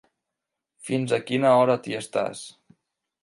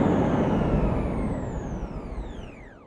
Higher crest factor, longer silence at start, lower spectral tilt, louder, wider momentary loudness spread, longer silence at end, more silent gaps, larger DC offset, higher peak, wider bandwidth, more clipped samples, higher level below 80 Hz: about the same, 20 dB vs 16 dB; first, 0.85 s vs 0 s; second, -5.5 dB/octave vs -8.5 dB/octave; first, -23 LUFS vs -27 LUFS; first, 21 LU vs 15 LU; first, 0.75 s vs 0 s; neither; neither; first, -6 dBFS vs -10 dBFS; first, 11.5 kHz vs 9.8 kHz; neither; second, -72 dBFS vs -34 dBFS